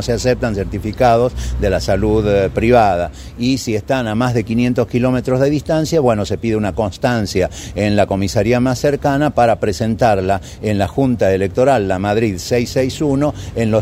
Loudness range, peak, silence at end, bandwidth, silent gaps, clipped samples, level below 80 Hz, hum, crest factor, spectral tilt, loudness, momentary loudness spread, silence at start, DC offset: 1 LU; 0 dBFS; 0 s; 16 kHz; none; under 0.1%; -32 dBFS; none; 16 dB; -6.5 dB/octave; -16 LUFS; 6 LU; 0 s; under 0.1%